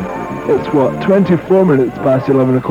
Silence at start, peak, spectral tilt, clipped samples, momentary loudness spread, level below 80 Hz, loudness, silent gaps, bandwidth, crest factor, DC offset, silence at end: 0 s; 0 dBFS; -9 dB/octave; under 0.1%; 5 LU; -44 dBFS; -13 LUFS; none; 10 kHz; 12 dB; under 0.1%; 0 s